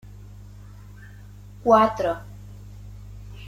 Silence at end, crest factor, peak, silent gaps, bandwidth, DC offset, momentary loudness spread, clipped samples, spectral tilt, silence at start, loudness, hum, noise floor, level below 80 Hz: 0 s; 22 dB; -4 dBFS; none; 15.5 kHz; under 0.1%; 27 LU; under 0.1%; -6.5 dB/octave; 1 s; -21 LUFS; 50 Hz at -40 dBFS; -43 dBFS; -46 dBFS